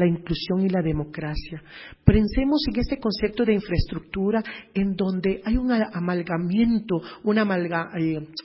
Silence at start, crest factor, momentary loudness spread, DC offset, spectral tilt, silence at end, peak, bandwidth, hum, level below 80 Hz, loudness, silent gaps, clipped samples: 0 s; 22 dB; 9 LU; under 0.1%; -11 dB/octave; 0 s; 0 dBFS; 5.8 kHz; none; -36 dBFS; -24 LUFS; none; under 0.1%